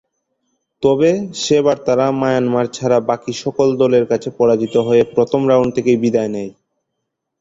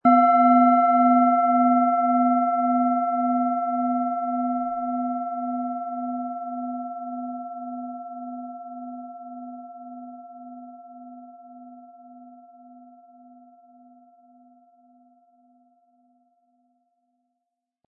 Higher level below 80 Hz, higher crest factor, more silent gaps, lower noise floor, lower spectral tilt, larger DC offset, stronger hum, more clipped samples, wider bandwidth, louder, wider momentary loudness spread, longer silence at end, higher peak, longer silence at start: first, -54 dBFS vs -76 dBFS; about the same, 14 dB vs 18 dB; neither; second, -76 dBFS vs -82 dBFS; second, -6 dB/octave vs -10.5 dB/octave; neither; neither; neither; first, 7.8 kHz vs 4.2 kHz; first, -16 LUFS vs -22 LUFS; second, 6 LU vs 25 LU; second, 0.9 s vs 5.55 s; first, -2 dBFS vs -6 dBFS; first, 0.8 s vs 0.05 s